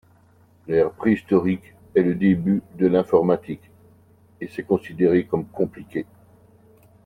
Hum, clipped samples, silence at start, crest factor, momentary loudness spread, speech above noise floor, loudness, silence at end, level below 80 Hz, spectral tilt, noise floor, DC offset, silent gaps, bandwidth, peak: none; under 0.1%; 0.7 s; 20 dB; 14 LU; 35 dB; -22 LUFS; 1 s; -58 dBFS; -9.5 dB/octave; -55 dBFS; under 0.1%; none; 4.7 kHz; -4 dBFS